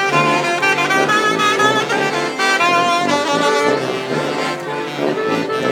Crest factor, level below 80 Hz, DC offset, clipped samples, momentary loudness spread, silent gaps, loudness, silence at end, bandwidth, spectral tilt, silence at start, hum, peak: 16 dB; -66 dBFS; under 0.1%; under 0.1%; 7 LU; none; -16 LUFS; 0 s; 18.5 kHz; -3.5 dB/octave; 0 s; none; -2 dBFS